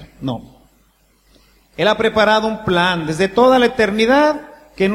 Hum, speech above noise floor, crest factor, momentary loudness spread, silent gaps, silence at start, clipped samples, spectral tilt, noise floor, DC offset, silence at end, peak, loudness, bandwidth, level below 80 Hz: none; 41 dB; 16 dB; 14 LU; none; 0 s; under 0.1%; -5 dB/octave; -56 dBFS; under 0.1%; 0 s; 0 dBFS; -15 LUFS; 15.5 kHz; -46 dBFS